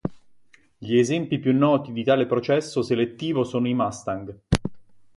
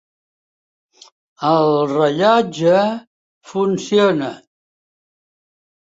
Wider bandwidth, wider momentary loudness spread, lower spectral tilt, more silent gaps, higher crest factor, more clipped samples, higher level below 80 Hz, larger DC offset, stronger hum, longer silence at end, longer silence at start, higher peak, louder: first, 11.5 kHz vs 8 kHz; about the same, 11 LU vs 9 LU; about the same, -6.5 dB/octave vs -6 dB/octave; second, none vs 3.07-3.41 s; first, 22 dB vs 16 dB; neither; first, -46 dBFS vs -64 dBFS; neither; neither; second, 0.35 s vs 1.45 s; second, 0.05 s vs 1.4 s; about the same, 0 dBFS vs -2 dBFS; second, -23 LUFS vs -16 LUFS